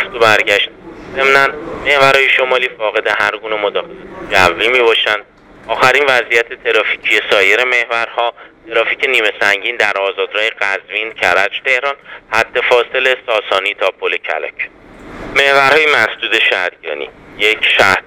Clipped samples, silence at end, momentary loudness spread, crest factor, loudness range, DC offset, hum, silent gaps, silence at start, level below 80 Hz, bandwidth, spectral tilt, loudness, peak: 0.1%; 0.05 s; 11 LU; 14 dB; 3 LU; under 0.1%; none; none; 0 s; -48 dBFS; 19.5 kHz; -2.5 dB/octave; -12 LUFS; 0 dBFS